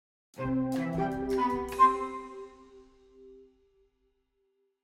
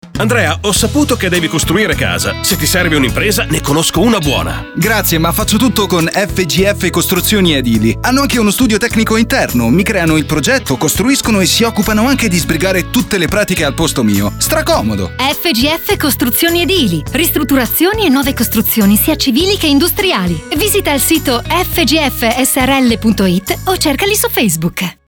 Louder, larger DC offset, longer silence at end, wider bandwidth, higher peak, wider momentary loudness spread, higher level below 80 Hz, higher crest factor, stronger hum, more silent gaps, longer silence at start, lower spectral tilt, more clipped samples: second, -29 LUFS vs -11 LUFS; neither; first, 1.4 s vs 0.15 s; second, 16 kHz vs over 20 kHz; second, -12 dBFS vs -2 dBFS; first, 20 LU vs 3 LU; second, -56 dBFS vs -28 dBFS; first, 22 dB vs 10 dB; neither; neither; first, 0.35 s vs 0.05 s; first, -7 dB/octave vs -4 dB/octave; neither